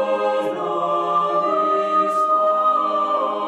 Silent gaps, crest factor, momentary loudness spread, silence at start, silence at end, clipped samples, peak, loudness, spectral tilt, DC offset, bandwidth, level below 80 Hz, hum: none; 10 dB; 4 LU; 0 s; 0 s; under 0.1%; -8 dBFS; -19 LUFS; -5.5 dB/octave; under 0.1%; 11 kHz; -72 dBFS; none